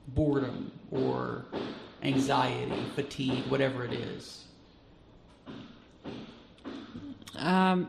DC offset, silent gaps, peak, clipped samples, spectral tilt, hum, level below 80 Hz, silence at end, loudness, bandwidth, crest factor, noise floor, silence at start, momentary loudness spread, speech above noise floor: under 0.1%; none; -12 dBFS; under 0.1%; -6.5 dB/octave; none; -54 dBFS; 0 s; -32 LUFS; 13 kHz; 20 dB; -57 dBFS; 0.05 s; 20 LU; 27 dB